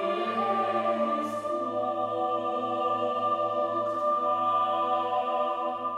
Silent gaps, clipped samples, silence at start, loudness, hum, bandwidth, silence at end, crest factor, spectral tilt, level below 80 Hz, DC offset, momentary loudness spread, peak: none; under 0.1%; 0 s; -28 LUFS; none; 12 kHz; 0 s; 12 dB; -5.5 dB/octave; -74 dBFS; under 0.1%; 4 LU; -16 dBFS